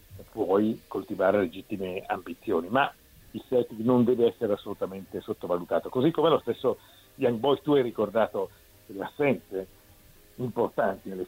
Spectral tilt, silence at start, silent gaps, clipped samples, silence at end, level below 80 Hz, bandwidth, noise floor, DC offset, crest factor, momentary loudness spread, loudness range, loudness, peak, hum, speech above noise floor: -7 dB/octave; 0.1 s; none; under 0.1%; 0 s; -62 dBFS; 16 kHz; -55 dBFS; under 0.1%; 18 dB; 13 LU; 3 LU; -28 LUFS; -10 dBFS; none; 28 dB